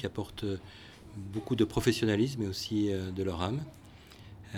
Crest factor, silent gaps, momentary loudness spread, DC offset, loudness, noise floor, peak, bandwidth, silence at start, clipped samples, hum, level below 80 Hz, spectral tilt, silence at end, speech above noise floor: 22 dB; none; 22 LU; under 0.1%; -32 LUFS; -52 dBFS; -12 dBFS; 17 kHz; 0 s; under 0.1%; none; -54 dBFS; -6 dB/octave; 0 s; 20 dB